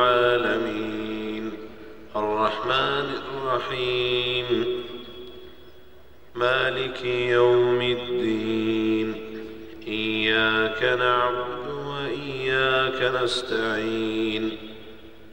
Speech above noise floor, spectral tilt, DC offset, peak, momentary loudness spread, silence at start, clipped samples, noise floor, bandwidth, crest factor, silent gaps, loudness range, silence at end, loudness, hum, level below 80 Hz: 28 dB; -5 dB/octave; 0.6%; -6 dBFS; 17 LU; 0 s; under 0.1%; -52 dBFS; 16 kHz; 18 dB; none; 4 LU; 0.05 s; -24 LUFS; none; -54 dBFS